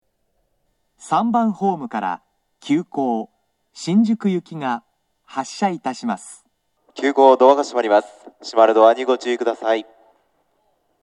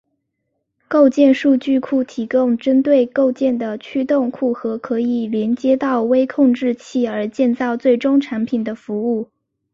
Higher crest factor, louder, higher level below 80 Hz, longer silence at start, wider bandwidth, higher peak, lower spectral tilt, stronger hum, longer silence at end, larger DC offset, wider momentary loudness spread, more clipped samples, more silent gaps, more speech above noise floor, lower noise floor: about the same, 20 dB vs 16 dB; about the same, -19 LUFS vs -17 LUFS; second, -76 dBFS vs -62 dBFS; about the same, 1 s vs 0.9 s; first, 11.5 kHz vs 7.4 kHz; about the same, 0 dBFS vs -2 dBFS; about the same, -6 dB/octave vs -6.5 dB/octave; neither; first, 1.2 s vs 0.5 s; neither; first, 16 LU vs 8 LU; neither; neither; second, 51 dB vs 57 dB; second, -69 dBFS vs -73 dBFS